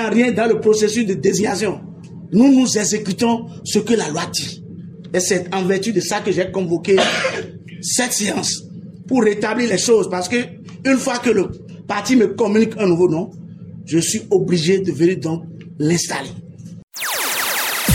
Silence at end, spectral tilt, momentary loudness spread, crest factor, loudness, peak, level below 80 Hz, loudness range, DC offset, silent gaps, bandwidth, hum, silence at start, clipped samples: 0 s; -4 dB/octave; 17 LU; 16 dB; -18 LUFS; -2 dBFS; -56 dBFS; 3 LU; under 0.1%; 16.83-16.88 s; 17 kHz; none; 0 s; under 0.1%